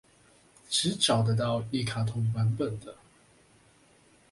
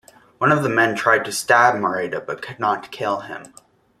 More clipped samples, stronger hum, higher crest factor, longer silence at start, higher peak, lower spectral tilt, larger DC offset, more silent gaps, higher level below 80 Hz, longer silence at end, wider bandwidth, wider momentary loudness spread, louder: neither; neither; about the same, 20 dB vs 20 dB; first, 0.7 s vs 0.4 s; second, -10 dBFS vs -2 dBFS; about the same, -4.5 dB/octave vs -4.5 dB/octave; neither; neither; about the same, -60 dBFS vs -62 dBFS; first, 1.4 s vs 0.55 s; second, 11.5 kHz vs 15 kHz; second, 9 LU vs 13 LU; second, -28 LUFS vs -19 LUFS